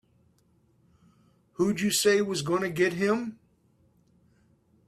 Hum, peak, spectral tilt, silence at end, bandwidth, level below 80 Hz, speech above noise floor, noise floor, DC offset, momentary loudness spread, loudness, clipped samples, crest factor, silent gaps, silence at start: none; -10 dBFS; -4 dB/octave; 1.55 s; 15.5 kHz; -68 dBFS; 40 dB; -66 dBFS; under 0.1%; 8 LU; -26 LUFS; under 0.1%; 20 dB; none; 1.6 s